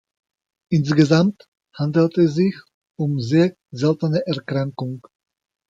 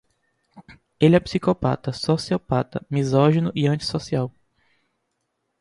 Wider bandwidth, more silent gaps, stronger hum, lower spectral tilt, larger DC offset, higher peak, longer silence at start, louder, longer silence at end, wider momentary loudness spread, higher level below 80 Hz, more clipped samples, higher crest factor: second, 7.8 kHz vs 11.5 kHz; first, 1.48-1.52 s, 2.74-2.82 s vs none; neither; about the same, -7.5 dB/octave vs -7 dB/octave; neither; about the same, -2 dBFS vs -4 dBFS; first, 0.7 s vs 0.55 s; about the same, -20 LUFS vs -22 LUFS; second, 0.7 s vs 1.3 s; first, 11 LU vs 8 LU; second, -60 dBFS vs -50 dBFS; neither; about the same, 18 dB vs 20 dB